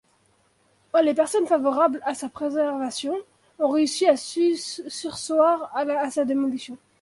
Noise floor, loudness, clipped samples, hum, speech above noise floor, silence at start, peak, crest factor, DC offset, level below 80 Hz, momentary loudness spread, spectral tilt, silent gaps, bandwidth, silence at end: -64 dBFS; -24 LUFS; under 0.1%; none; 41 dB; 0.95 s; -6 dBFS; 18 dB; under 0.1%; -70 dBFS; 11 LU; -3 dB/octave; none; 11.5 kHz; 0.25 s